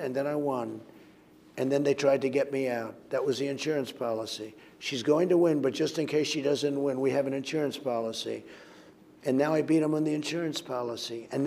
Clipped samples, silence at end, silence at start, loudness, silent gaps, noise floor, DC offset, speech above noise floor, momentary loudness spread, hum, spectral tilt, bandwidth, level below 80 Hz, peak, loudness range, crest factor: under 0.1%; 0 s; 0 s; -29 LUFS; none; -56 dBFS; under 0.1%; 27 dB; 11 LU; none; -5 dB/octave; 16 kHz; -78 dBFS; -12 dBFS; 3 LU; 18 dB